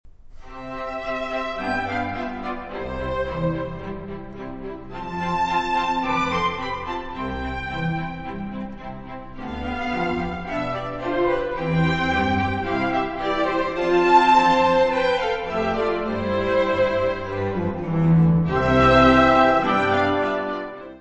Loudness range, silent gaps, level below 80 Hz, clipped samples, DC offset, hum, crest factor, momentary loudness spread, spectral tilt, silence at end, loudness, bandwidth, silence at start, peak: 10 LU; none; -40 dBFS; under 0.1%; 0.2%; none; 18 dB; 17 LU; -7 dB/octave; 0 s; -21 LUFS; 8.2 kHz; 0.05 s; -4 dBFS